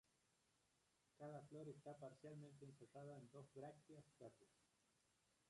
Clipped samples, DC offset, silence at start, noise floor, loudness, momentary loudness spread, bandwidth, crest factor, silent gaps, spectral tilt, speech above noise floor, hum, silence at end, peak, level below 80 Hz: under 0.1%; under 0.1%; 0.05 s; -85 dBFS; -61 LUFS; 8 LU; 11 kHz; 16 dB; none; -7 dB/octave; 24 dB; none; 0 s; -46 dBFS; under -90 dBFS